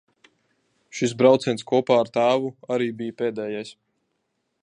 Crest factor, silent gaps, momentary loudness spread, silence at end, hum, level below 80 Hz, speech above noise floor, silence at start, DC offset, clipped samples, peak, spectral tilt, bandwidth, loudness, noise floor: 20 dB; none; 13 LU; 0.9 s; none; -72 dBFS; 53 dB; 0.95 s; under 0.1%; under 0.1%; -4 dBFS; -5.5 dB/octave; 10 kHz; -22 LUFS; -75 dBFS